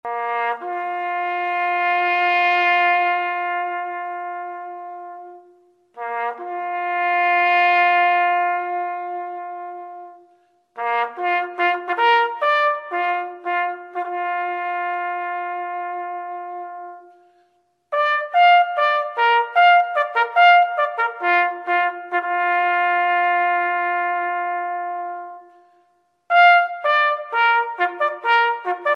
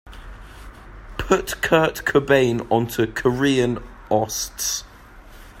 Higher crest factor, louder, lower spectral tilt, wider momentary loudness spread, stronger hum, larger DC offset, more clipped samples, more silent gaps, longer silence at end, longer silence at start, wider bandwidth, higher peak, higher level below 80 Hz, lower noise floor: about the same, 16 dB vs 20 dB; about the same, -19 LUFS vs -21 LUFS; second, -2 dB/octave vs -4.5 dB/octave; second, 16 LU vs 21 LU; neither; neither; neither; neither; about the same, 0 s vs 0 s; about the same, 0.05 s vs 0.05 s; second, 6 kHz vs 16 kHz; about the same, -4 dBFS vs -2 dBFS; second, -88 dBFS vs -42 dBFS; first, -64 dBFS vs -44 dBFS